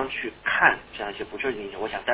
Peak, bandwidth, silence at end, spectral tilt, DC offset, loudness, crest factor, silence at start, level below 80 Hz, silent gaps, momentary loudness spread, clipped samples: -4 dBFS; 4 kHz; 0 s; -0.5 dB/octave; under 0.1%; -25 LUFS; 24 dB; 0 s; -56 dBFS; none; 13 LU; under 0.1%